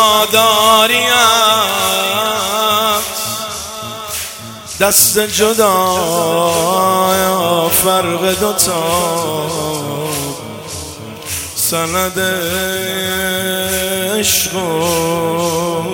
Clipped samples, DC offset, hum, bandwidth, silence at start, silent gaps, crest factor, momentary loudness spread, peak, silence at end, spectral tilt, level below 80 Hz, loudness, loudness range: under 0.1%; under 0.1%; none; over 20 kHz; 0 s; none; 14 dB; 13 LU; 0 dBFS; 0 s; -2 dB/octave; -46 dBFS; -13 LUFS; 6 LU